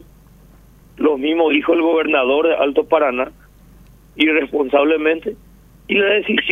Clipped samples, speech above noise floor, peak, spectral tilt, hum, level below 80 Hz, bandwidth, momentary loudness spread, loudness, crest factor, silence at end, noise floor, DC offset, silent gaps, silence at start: under 0.1%; 30 dB; 0 dBFS; -6 dB/octave; 50 Hz at -50 dBFS; -50 dBFS; 3.9 kHz; 5 LU; -16 LUFS; 16 dB; 0 s; -46 dBFS; under 0.1%; none; 1 s